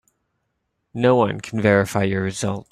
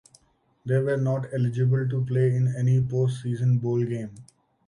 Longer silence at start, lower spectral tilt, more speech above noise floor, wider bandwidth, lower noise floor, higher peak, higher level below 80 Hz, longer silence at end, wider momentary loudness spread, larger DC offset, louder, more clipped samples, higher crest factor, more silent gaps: first, 0.95 s vs 0.65 s; second, -6 dB/octave vs -9 dB/octave; first, 55 dB vs 40 dB; first, 15 kHz vs 10.5 kHz; first, -74 dBFS vs -64 dBFS; first, -2 dBFS vs -12 dBFS; first, -56 dBFS vs -62 dBFS; second, 0.1 s vs 0.45 s; first, 8 LU vs 5 LU; neither; first, -20 LUFS vs -25 LUFS; neither; first, 18 dB vs 12 dB; neither